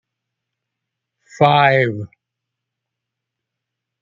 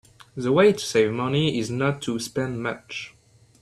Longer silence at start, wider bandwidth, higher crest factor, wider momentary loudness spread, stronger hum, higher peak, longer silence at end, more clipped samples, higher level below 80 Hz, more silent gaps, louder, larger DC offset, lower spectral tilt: first, 1.4 s vs 0.35 s; second, 7.6 kHz vs 13 kHz; about the same, 20 dB vs 18 dB; first, 19 LU vs 16 LU; neither; first, -2 dBFS vs -6 dBFS; first, 1.95 s vs 0.55 s; neither; second, -64 dBFS vs -58 dBFS; neither; first, -15 LUFS vs -23 LUFS; neither; about the same, -6.5 dB/octave vs -5.5 dB/octave